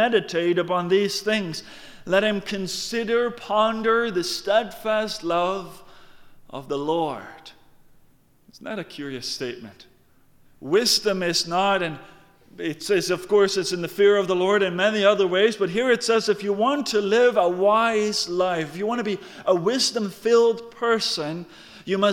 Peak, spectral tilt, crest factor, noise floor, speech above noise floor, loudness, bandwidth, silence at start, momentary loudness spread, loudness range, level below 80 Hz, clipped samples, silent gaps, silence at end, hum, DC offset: -6 dBFS; -3.5 dB/octave; 18 dB; -56 dBFS; 34 dB; -22 LUFS; 17.5 kHz; 0 s; 14 LU; 11 LU; -60 dBFS; under 0.1%; none; 0 s; none; under 0.1%